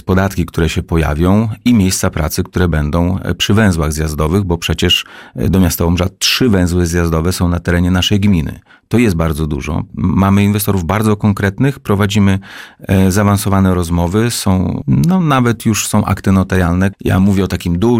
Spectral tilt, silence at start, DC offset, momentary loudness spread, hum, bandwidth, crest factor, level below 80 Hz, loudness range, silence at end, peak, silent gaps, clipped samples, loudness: -5.5 dB/octave; 0.05 s; 0.4%; 5 LU; none; 16.5 kHz; 12 dB; -28 dBFS; 1 LU; 0 s; -2 dBFS; none; under 0.1%; -13 LUFS